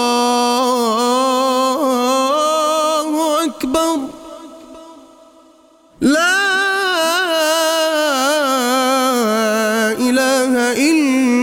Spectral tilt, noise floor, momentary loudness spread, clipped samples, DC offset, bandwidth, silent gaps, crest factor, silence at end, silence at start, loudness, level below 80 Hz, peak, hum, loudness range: -2 dB/octave; -49 dBFS; 3 LU; under 0.1%; under 0.1%; 17 kHz; none; 14 dB; 0 s; 0 s; -15 LUFS; -56 dBFS; -2 dBFS; none; 5 LU